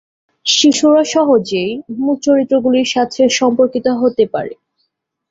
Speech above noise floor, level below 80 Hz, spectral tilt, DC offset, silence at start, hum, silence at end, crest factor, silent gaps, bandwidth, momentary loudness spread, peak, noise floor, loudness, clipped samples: 55 dB; -58 dBFS; -3.5 dB/octave; under 0.1%; 0.45 s; none; 0.8 s; 14 dB; none; 7.8 kHz; 9 LU; 0 dBFS; -68 dBFS; -13 LUFS; under 0.1%